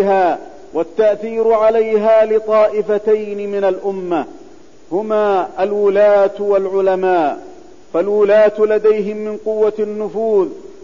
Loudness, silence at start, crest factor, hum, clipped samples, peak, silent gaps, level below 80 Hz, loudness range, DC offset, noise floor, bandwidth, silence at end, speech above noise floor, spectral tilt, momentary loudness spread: -15 LUFS; 0 s; 10 dB; none; under 0.1%; -4 dBFS; none; -56 dBFS; 3 LU; 1%; -42 dBFS; 7.4 kHz; 0.15 s; 28 dB; -7 dB/octave; 10 LU